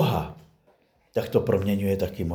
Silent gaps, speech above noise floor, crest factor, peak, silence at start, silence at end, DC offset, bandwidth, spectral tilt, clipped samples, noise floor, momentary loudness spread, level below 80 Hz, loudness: none; 39 dB; 20 dB; -6 dBFS; 0 s; 0 s; under 0.1%; over 20 kHz; -7.5 dB/octave; under 0.1%; -63 dBFS; 8 LU; -48 dBFS; -26 LUFS